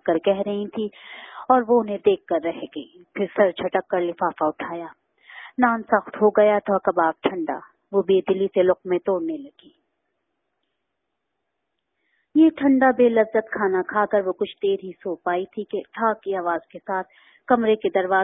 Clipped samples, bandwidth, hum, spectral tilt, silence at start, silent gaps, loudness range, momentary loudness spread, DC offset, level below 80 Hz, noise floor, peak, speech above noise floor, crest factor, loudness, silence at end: under 0.1%; 4 kHz; none; -10.5 dB/octave; 0.05 s; none; 6 LU; 14 LU; under 0.1%; -66 dBFS; -79 dBFS; -2 dBFS; 58 dB; 20 dB; -22 LUFS; 0 s